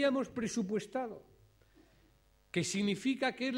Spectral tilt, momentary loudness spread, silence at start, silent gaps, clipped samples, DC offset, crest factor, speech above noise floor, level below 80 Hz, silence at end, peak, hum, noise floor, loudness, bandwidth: -4.5 dB/octave; 7 LU; 0 s; none; under 0.1%; under 0.1%; 18 dB; 33 dB; -70 dBFS; 0 s; -18 dBFS; none; -68 dBFS; -35 LUFS; 15.5 kHz